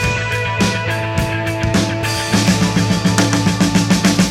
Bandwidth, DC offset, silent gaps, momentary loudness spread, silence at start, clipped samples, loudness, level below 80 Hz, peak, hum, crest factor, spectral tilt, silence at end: 16 kHz; under 0.1%; none; 5 LU; 0 s; under 0.1%; -16 LUFS; -34 dBFS; 0 dBFS; none; 16 dB; -4.5 dB/octave; 0 s